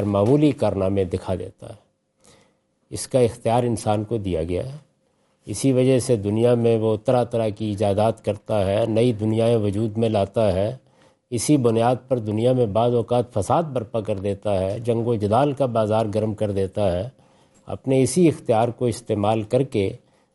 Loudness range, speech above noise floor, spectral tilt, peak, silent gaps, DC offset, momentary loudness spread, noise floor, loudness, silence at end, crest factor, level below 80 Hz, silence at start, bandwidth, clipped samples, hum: 4 LU; 45 dB; -7 dB/octave; -6 dBFS; none; under 0.1%; 9 LU; -65 dBFS; -21 LUFS; 0.35 s; 16 dB; -56 dBFS; 0 s; 11.5 kHz; under 0.1%; none